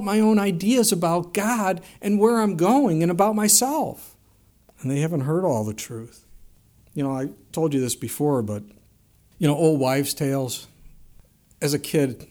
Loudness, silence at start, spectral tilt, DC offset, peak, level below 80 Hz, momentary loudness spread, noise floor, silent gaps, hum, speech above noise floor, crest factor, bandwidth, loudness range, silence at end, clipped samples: -22 LUFS; 0 s; -5 dB/octave; under 0.1%; -4 dBFS; -58 dBFS; 12 LU; -58 dBFS; none; none; 36 dB; 18 dB; over 20 kHz; 7 LU; 0.05 s; under 0.1%